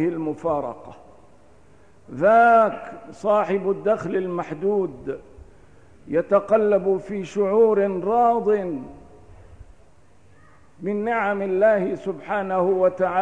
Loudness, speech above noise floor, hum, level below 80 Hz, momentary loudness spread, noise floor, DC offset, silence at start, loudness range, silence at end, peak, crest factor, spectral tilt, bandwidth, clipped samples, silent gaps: -21 LUFS; 34 dB; none; -56 dBFS; 16 LU; -55 dBFS; 0.3%; 0 s; 5 LU; 0 s; -6 dBFS; 16 dB; -7.5 dB/octave; 9.6 kHz; under 0.1%; none